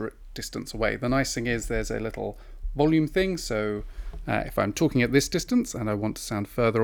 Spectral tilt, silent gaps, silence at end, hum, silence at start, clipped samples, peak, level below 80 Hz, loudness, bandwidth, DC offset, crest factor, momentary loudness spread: -5 dB/octave; none; 0 s; none; 0 s; under 0.1%; -6 dBFS; -40 dBFS; -27 LUFS; 20 kHz; under 0.1%; 20 dB; 13 LU